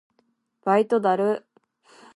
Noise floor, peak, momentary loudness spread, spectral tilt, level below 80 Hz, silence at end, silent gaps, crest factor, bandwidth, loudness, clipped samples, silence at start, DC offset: -69 dBFS; -6 dBFS; 11 LU; -7 dB/octave; -80 dBFS; 0.75 s; none; 18 dB; 11.5 kHz; -23 LUFS; under 0.1%; 0.65 s; under 0.1%